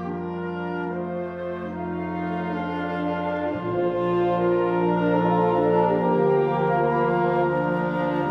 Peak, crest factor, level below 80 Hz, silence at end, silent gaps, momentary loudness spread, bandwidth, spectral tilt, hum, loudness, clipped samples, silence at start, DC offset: -8 dBFS; 14 dB; -54 dBFS; 0 s; none; 10 LU; 5.6 kHz; -9.5 dB/octave; none; -24 LUFS; under 0.1%; 0 s; under 0.1%